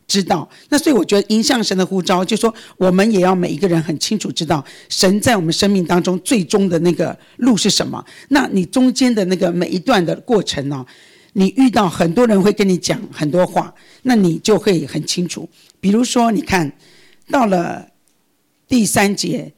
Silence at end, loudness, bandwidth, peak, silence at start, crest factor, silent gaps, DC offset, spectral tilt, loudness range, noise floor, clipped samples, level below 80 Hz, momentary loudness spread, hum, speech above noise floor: 0.05 s; -16 LUFS; 19 kHz; -6 dBFS; 0.1 s; 10 dB; none; under 0.1%; -4.5 dB/octave; 3 LU; -63 dBFS; under 0.1%; -48 dBFS; 8 LU; none; 47 dB